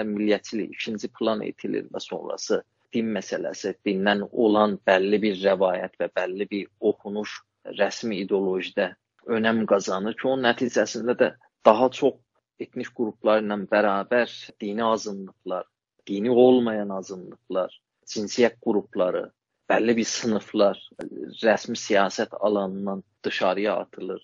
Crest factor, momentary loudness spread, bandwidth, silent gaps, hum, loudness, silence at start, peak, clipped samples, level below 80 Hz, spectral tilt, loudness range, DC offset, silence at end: 24 dB; 13 LU; 7.4 kHz; none; none; -25 LUFS; 0 s; 0 dBFS; under 0.1%; -70 dBFS; -3.5 dB/octave; 4 LU; under 0.1%; 0.05 s